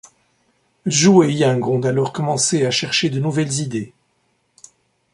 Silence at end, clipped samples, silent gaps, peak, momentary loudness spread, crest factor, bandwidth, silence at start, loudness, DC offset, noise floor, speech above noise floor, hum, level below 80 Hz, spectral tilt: 1.25 s; under 0.1%; none; -2 dBFS; 12 LU; 18 dB; 11.5 kHz; 0.85 s; -17 LUFS; under 0.1%; -65 dBFS; 48 dB; none; -58 dBFS; -4.5 dB/octave